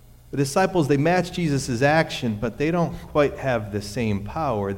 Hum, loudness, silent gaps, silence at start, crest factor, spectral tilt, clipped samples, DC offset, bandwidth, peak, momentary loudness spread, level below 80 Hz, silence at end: none; -23 LUFS; none; 0.3 s; 16 dB; -6 dB/octave; under 0.1%; under 0.1%; 16.5 kHz; -8 dBFS; 7 LU; -44 dBFS; 0 s